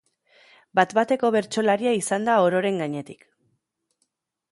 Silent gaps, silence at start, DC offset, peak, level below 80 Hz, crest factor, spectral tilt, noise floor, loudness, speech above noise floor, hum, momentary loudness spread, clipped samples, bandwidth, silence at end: none; 0.75 s; under 0.1%; -4 dBFS; -72 dBFS; 20 dB; -4.5 dB/octave; -75 dBFS; -22 LUFS; 53 dB; none; 9 LU; under 0.1%; 11.5 kHz; 1.4 s